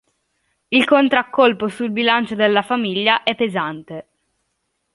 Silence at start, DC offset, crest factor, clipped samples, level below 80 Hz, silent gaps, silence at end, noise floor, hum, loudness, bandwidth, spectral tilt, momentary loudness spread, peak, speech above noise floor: 0.7 s; under 0.1%; 18 dB; under 0.1%; -64 dBFS; none; 0.95 s; -72 dBFS; none; -17 LUFS; 11.5 kHz; -5.5 dB/octave; 11 LU; 0 dBFS; 55 dB